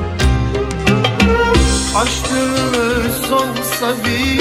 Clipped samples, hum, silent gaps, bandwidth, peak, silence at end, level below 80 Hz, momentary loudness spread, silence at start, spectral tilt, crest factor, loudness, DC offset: under 0.1%; none; none; 16 kHz; 0 dBFS; 0 s; -22 dBFS; 5 LU; 0 s; -4.5 dB/octave; 14 dB; -15 LUFS; under 0.1%